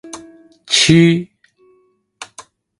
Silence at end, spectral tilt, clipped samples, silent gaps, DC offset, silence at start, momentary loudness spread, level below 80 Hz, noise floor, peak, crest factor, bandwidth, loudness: 0.55 s; -4.5 dB/octave; under 0.1%; none; under 0.1%; 0.05 s; 26 LU; -50 dBFS; -58 dBFS; 0 dBFS; 18 dB; 11.5 kHz; -12 LUFS